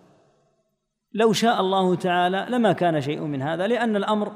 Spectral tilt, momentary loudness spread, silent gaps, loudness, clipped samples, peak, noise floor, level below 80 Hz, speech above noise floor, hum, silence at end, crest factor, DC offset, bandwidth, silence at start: -5.5 dB/octave; 7 LU; none; -22 LUFS; under 0.1%; -8 dBFS; -75 dBFS; -72 dBFS; 54 dB; none; 0 s; 16 dB; under 0.1%; 15.5 kHz; 1.15 s